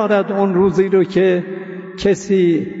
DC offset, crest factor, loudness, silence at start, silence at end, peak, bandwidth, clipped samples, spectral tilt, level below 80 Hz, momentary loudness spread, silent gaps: under 0.1%; 12 dB; -16 LUFS; 0 s; 0 s; -4 dBFS; 8 kHz; under 0.1%; -7 dB/octave; -48 dBFS; 11 LU; none